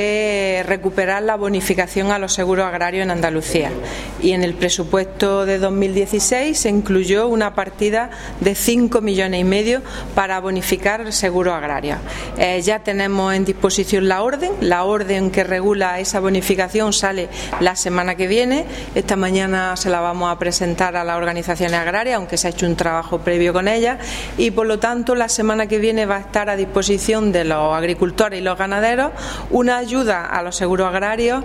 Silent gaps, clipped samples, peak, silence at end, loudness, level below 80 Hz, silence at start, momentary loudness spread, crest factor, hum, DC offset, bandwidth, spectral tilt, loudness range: none; under 0.1%; 0 dBFS; 0 s; -18 LUFS; -36 dBFS; 0 s; 4 LU; 18 dB; none; under 0.1%; 16 kHz; -4 dB/octave; 2 LU